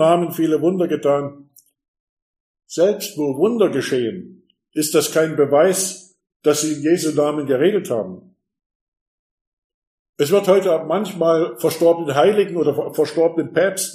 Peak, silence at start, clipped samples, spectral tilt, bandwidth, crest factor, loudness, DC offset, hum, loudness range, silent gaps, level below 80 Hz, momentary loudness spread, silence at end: -2 dBFS; 0 s; under 0.1%; -4.5 dB/octave; 15.5 kHz; 16 dB; -18 LUFS; under 0.1%; none; 4 LU; 1.88-1.94 s, 2.00-2.34 s, 2.40-2.54 s, 6.36-6.40 s, 8.66-8.92 s, 9.01-10.13 s; -70 dBFS; 8 LU; 0 s